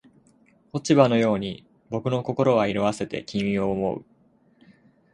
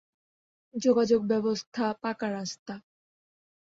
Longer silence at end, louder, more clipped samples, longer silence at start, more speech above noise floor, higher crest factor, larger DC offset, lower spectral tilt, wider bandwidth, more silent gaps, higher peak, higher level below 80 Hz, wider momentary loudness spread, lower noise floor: about the same, 1.1 s vs 1 s; first, -24 LUFS vs -28 LUFS; neither; about the same, 0.75 s vs 0.75 s; second, 38 dB vs over 62 dB; first, 24 dB vs 18 dB; neither; first, -6.5 dB/octave vs -5 dB/octave; first, 11 kHz vs 7.8 kHz; second, none vs 1.67-1.72 s, 2.59-2.66 s; first, -2 dBFS vs -12 dBFS; first, -56 dBFS vs -72 dBFS; about the same, 15 LU vs 17 LU; second, -60 dBFS vs under -90 dBFS